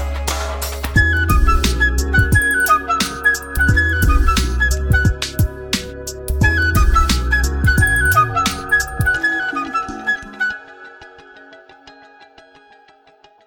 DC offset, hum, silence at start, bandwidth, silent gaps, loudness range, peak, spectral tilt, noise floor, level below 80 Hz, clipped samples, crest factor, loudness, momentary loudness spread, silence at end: under 0.1%; none; 0 s; 17.5 kHz; none; 9 LU; -2 dBFS; -4 dB/octave; -50 dBFS; -22 dBFS; under 0.1%; 16 dB; -16 LUFS; 8 LU; 1.55 s